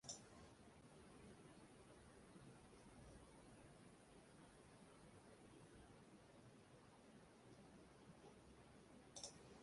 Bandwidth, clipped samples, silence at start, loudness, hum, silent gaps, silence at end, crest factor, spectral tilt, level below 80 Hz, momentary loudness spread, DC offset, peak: 11.5 kHz; under 0.1%; 0.05 s; -65 LUFS; none; none; 0 s; 26 dB; -3.5 dB/octave; -78 dBFS; 9 LU; under 0.1%; -38 dBFS